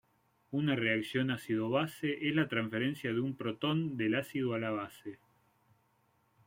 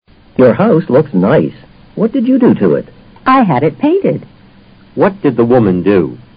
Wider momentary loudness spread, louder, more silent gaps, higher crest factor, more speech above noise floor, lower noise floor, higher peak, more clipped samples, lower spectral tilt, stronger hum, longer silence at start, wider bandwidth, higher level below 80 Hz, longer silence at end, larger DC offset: about the same, 7 LU vs 9 LU; second, -34 LUFS vs -11 LUFS; neither; first, 18 dB vs 12 dB; first, 39 dB vs 31 dB; first, -73 dBFS vs -41 dBFS; second, -18 dBFS vs 0 dBFS; neither; second, -6.5 dB/octave vs -12 dB/octave; neither; about the same, 0.5 s vs 0.4 s; first, 16.5 kHz vs 5.2 kHz; second, -74 dBFS vs -44 dBFS; first, 1.3 s vs 0.2 s; neither